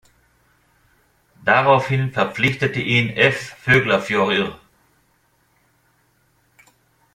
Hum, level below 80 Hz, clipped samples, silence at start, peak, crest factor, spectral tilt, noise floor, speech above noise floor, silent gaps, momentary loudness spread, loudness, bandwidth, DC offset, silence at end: none; -54 dBFS; under 0.1%; 1.4 s; -2 dBFS; 20 dB; -5.5 dB/octave; -62 dBFS; 44 dB; none; 7 LU; -18 LUFS; 14.5 kHz; under 0.1%; 2.6 s